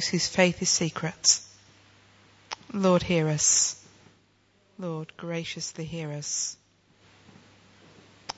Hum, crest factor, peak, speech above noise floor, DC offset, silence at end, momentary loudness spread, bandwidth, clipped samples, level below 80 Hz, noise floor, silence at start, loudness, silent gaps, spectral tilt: none; 24 dB; -6 dBFS; 38 dB; under 0.1%; 0.05 s; 15 LU; 8.2 kHz; under 0.1%; -60 dBFS; -65 dBFS; 0 s; -25 LUFS; none; -3 dB/octave